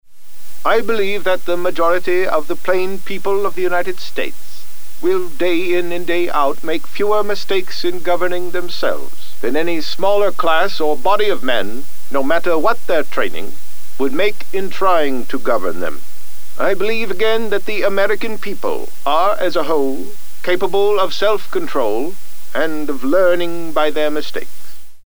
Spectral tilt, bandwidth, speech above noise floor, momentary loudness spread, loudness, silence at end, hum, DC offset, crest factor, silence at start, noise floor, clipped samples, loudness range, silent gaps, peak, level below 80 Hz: -4.5 dB/octave; over 20 kHz; 23 dB; 12 LU; -18 LUFS; 0 s; none; 20%; 16 dB; 0 s; -41 dBFS; under 0.1%; 2 LU; none; 0 dBFS; -56 dBFS